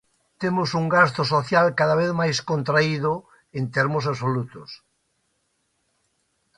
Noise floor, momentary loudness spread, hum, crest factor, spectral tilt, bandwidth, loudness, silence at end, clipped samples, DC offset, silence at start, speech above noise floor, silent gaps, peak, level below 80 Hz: -71 dBFS; 13 LU; none; 20 dB; -5.5 dB/octave; 11 kHz; -22 LUFS; 1.85 s; under 0.1%; under 0.1%; 0.4 s; 50 dB; none; -4 dBFS; -60 dBFS